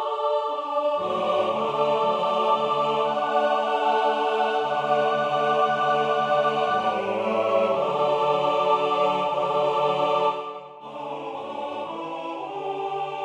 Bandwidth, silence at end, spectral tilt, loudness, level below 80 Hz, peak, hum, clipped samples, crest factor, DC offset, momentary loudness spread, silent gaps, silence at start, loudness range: 10 kHz; 0 s; -5 dB/octave; -24 LUFS; -72 dBFS; -8 dBFS; none; under 0.1%; 16 dB; under 0.1%; 10 LU; none; 0 s; 4 LU